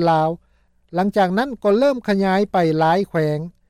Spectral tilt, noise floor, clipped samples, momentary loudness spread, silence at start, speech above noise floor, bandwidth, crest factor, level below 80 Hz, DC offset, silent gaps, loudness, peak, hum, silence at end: -7.5 dB/octave; -59 dBFS; under 0.1%; 6 LU; 0 s; 41 dB; 14 kHz; 12 dB; -54 dBFS; under 0.1%; none; -19 LUFS; -8 dBFS; none; 0.2 s